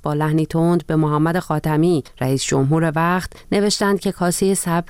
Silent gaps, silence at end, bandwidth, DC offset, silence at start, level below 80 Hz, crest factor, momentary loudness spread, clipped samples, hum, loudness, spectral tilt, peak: none; 0 s; 17 kHz; under 0.1%; 0.05 s; -44 dBFS; 12 dB; 4 LU; under 0.1%; none; -19 LUFS; -5.5 dB/octave; -8 dBFS